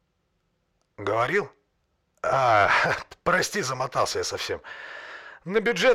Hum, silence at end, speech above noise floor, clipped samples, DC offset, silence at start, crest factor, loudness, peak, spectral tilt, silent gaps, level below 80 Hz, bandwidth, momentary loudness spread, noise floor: none; 0 s; 49 dB; under 0.1%; under 0.1%; 1 s; 18 dB; -24 LUFS; -8 dBFS; -3.5 dB/octave; none; -58 dBFS; 16.5 kHz; 19 LU; -73 dBFS